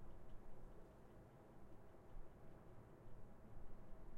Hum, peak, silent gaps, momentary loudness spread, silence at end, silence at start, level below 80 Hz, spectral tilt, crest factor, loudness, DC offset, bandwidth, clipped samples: none; -40 dBFS; none; 2 LU; 0 s; 0 s; -62 dBFS; -7.5 dB/octave; 12 dB; -65 LUFS; under 0.1%; 4.1 kHz; under 0.1%